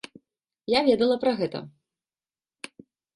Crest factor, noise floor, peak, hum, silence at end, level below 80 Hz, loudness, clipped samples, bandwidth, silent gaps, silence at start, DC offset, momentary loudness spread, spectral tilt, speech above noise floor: 20 dB; under -90 dBFS; -8 dBFS; none; 1.45 s; -66 dBFS; -24 LUFS; under 0.1%; 11.5 kHz; none; 0.7 s; under 0.1%; 22 LU; -5.5 dB/octave; over 67 dB